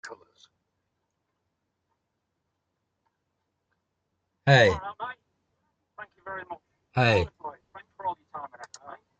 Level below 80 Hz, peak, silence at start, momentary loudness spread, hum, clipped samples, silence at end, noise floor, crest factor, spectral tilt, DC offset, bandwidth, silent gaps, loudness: -58 dBFS; -4 dBFS; 0.05 s; 26 LU; none; under 0.1%; 0.25 s; -80 dBFS; 26 dB; -5.5 dB/octave; under 0.1%; 8.6 kHz; none; -24 LUFS